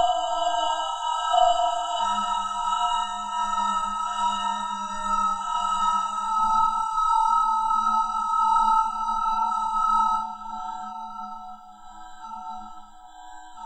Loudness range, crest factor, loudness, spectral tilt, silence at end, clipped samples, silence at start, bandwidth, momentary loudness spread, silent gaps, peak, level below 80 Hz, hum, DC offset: 6 LU; 18 dB; -24 LUFS; -1.5 dB/octave; 0 s; under 0.1%; 0 s; 10 kHz; 17 LU; none; -8 dBFS; -48 dBFS; none; under 0.1%